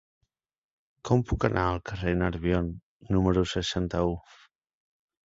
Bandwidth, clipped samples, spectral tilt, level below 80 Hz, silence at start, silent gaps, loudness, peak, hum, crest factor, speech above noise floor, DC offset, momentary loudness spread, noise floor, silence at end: 7.8 kHz; under 0.1%; -6.5 dB/octave; -42 dBFS; 1.05 s; 2.83-3.00 s; -28 LUFS; -8 dBFS; none; 22 dB; 62 dB; under 0.1%; 9 LU; -89 dBFS; 1.05 s